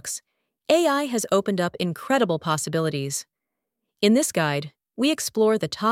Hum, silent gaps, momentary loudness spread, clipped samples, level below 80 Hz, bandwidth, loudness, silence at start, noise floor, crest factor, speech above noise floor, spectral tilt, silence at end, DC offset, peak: none; none; 10 LU; under 0.1%; -68 dBFS; 17 kHz; -23 LUFS; 0.05 s; -83 dBFS; 20 dB; 61 dB; -4.5 dB/octave; 0 s; under 0.1%; -4 dBFS